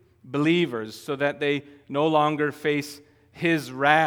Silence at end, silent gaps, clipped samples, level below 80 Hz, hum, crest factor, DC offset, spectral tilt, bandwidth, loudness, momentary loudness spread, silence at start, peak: 0 s; none; under 0.1%; -70 dBFS; none; 22 dB; under 0.1%; -5.5 dB/octave; 18 kHz; -25 LUFS; 11 LU; 0.25 s; -2 dBFS